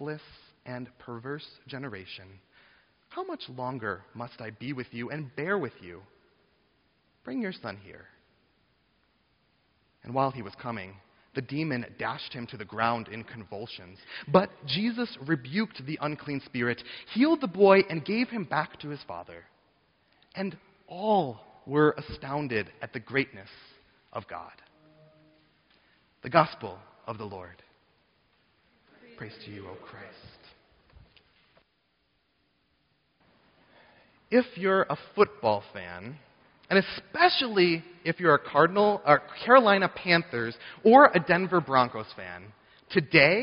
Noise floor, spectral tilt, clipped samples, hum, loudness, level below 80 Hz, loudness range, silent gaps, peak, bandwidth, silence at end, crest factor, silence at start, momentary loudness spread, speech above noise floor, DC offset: -73 dBFS; -3.5 dB/octave; under 0.1%; none; -26 LUFS; -66 dBFS; 19 LU; none; -2 dBFS; 5.4 kHz; 0 s; 28 dB; 0 s; 21 LU; 46 dB; under 0.1%